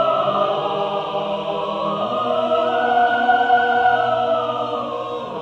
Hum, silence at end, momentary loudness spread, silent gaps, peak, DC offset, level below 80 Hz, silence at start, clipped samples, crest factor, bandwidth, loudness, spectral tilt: none; 0 s; 8 LU; none; -6 dBFS; under 0.1%; -58 dBFS; 0 s; under 0.1%; 14 dB; 7.6 kHz; -19 LUFS; -5.5 dB/octave